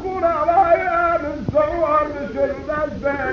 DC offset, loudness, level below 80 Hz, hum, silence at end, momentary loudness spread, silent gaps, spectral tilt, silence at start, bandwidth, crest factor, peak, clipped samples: under 0.1%; -19 LUFS; -40 dBFS; none; 0 s; 7 LU; none; -7.5 dB/octave; 0 s; 7 kHz; 14 dB; -4 dBFS; under 0.1%